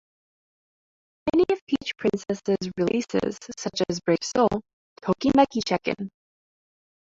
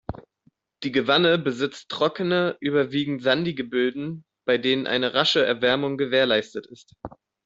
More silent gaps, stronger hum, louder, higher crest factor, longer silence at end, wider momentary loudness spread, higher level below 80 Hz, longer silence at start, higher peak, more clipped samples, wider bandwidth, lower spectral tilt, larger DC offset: first, 1.61-1.67 s, 4.73-4.96 s vs none; neither; about the same, -25 LUFS vs -23 LUFS; about the same, 20 dB vs 20 dB; first, 0.95 s vs 0.4 s; second, 11 LU vs 17 LU; about the same, -56 dBFS vs -58 dBFS; first, 1.25 s vs 0.1 s; about the same, -6 dBFS vs -4 dBFS; neither; about the same, 8 kHz vs 7.8 kHz; about the same, -5 dB/octave vs -5.5 dB/octave; neither